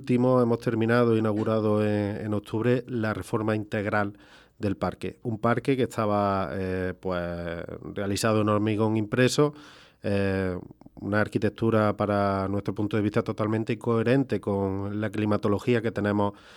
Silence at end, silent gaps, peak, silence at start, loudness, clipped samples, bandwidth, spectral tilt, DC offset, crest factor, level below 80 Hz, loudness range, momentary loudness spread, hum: 0.05 s; none; -8 dBFS; 0 s; -26 LUFS; under 0.1%; 13.5 kHz; -7 dB/octave; under 0.1%; 18 dB; -58 dBFS; 3 LU; 8 LU; none